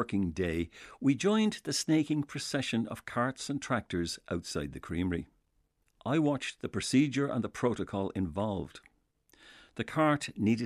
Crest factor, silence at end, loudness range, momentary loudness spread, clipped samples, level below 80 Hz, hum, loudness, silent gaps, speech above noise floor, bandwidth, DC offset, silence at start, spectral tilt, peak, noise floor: 18 dB; 0 s; 4 LU; 10 LU; under 0.1%; -56 dBFS; none; -32 LUFS; none; 43 dB; 13.5 kHz; under 0.1%; 0 s; -5.5 dB/octave; -14 dBFS; -74 dBFS